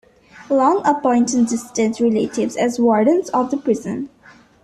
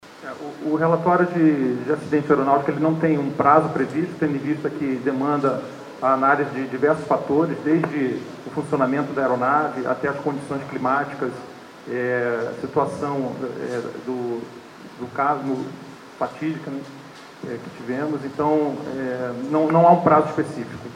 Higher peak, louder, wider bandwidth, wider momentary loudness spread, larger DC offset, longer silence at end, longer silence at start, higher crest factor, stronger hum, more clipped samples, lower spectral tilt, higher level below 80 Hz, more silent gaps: about the same, -4 dBFS vs -2 dBFS; first, -18 LUFS vs -22 LUFS; first, 13 kHz vs 11 kHz; second, 6 LU vs 15 LU; neither; first, 0.55 s vs 0 s; first, 0.35 s vs 0.05 s; second, 14 dB vs 20 dB; neither; neither; second, -5 dB/octave vs -7.5 dB/octave; first, -58 dBFS vs -64 dBFS; neither